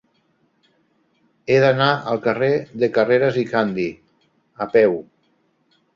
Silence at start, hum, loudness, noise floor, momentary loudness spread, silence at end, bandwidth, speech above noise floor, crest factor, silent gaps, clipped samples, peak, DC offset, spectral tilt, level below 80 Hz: 1.5 s; none; -19 LUFS; -64 dBFS; 11 LU; 0.95 s; 7.2 kHz; 46 dB; 18 dB; none; under 0.1%; -2 dBFS; under 0.1%; -7 dB/octave; -60 dBFS